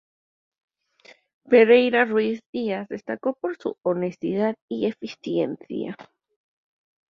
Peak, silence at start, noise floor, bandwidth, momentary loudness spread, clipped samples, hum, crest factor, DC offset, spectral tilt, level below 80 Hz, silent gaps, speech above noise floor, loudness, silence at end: -4 dBFS; 1.5 s; -54 dBFS; 6.4 kHz; 16 LU; under 0.1%; none; 20 dB; under 0.1%; -7 dB/octave; -70 dBFS; 2.46-2.53 s, 4.62-4.68 s; 31 dB; -23 LUFS; 1.1 s